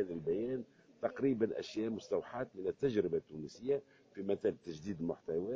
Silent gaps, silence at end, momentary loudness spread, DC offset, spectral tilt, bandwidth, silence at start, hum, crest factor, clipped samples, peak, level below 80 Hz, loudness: none; 0 s; 10 LU; under 0.1%; -7 dB/octave; 7.6 kHz; 0 s; none; 18 dB; under 0.1%; -20 dBFS; -68 dBFS; -38 LUFS